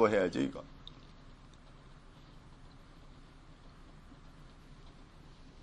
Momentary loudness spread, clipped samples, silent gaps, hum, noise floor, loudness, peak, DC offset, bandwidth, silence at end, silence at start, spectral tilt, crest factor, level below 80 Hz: 22 LU; under 0.1%; none; none; -55 dBFS; -34 LUFS; -14 dBFS; under 0.1%; 10 kHz; 0 s; 0 s; -6 dB/octave; 26 dB; -56 dBFS